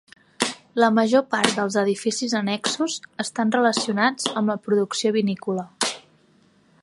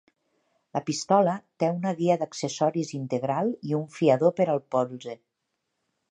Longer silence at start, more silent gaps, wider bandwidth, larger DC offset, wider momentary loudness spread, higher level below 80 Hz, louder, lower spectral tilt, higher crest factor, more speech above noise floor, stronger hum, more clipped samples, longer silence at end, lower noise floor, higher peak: second, 0.4 s vs 0.75 s; neither; first, 11.5 kHz vs 10 kHz; neither; second, 7 LU vs 10 LU; about the same, -72 dBFS vs -74 dBFS; first, -22 LUFS vs -26 LUFS; second, -3.5 dB/octave vs -6 dB/octave; about the same, 22 dB vs 20 dB; second, 37 dB vs 55 dB; neither; neither; about the same, 0.85 s vs 0.95 s; second, -58 dBFS vs -80 dBFS; first, 0 dBFS vs -6 dBFS